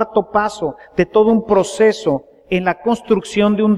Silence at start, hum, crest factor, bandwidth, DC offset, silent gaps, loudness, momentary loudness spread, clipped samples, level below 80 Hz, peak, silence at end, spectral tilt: 0 s; none; 14 dB; 11.5 kHz; under 0.1%; none; -16 LUFS; 8 LU; under 0.1%; -46 dBFS; -2 dBFS; 0 s; -6 dB/octave